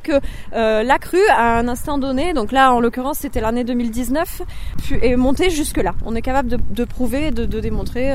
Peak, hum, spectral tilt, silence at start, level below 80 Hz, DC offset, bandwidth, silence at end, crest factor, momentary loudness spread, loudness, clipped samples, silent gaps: 0 dBFS; none; -5 dB/octave; 0 s; -28 dBFS; under 0.1%; 16 kHz; 0 s; 16 dB; 10 LU; -18 LUFS; under 0.1%; none